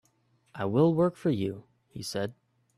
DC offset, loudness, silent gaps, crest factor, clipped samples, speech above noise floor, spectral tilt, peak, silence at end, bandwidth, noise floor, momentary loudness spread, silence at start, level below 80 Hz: under 0.1%; -29 LUFS; none; 16 dB; under 0.1%; 41 dB; -7 dB/octave; -14 dBFS; 0.45 s; 13.5 kHz; -69 dBFS; 22 LU; 0.55 s; -66 dBFS